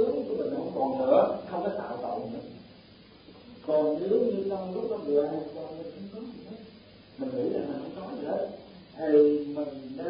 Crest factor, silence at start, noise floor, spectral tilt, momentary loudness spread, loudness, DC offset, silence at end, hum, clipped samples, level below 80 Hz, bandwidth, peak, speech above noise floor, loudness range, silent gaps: 20 dB; 0 s; -53 dBFS; -10.5 dB/octave; 19 LU; -29 LUFS; under 0.1%; 0 s; none; under 0.1%; -66 dBFS; 5.2 kHz; -8 dBFS; 25 dB; 6 LU; none